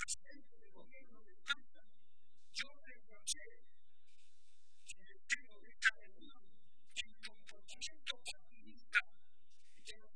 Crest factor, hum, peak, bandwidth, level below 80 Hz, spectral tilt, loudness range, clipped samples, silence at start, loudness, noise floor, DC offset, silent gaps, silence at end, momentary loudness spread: 30 dB; none; -18 dBFS; 10.5 kHz; -78 dBFS; 1 dB/octave; 6 LU; under 0.1%; 0 s; -42 LUFS; -78 dBFS; 0.6%; none; 0.2 s; 26 LU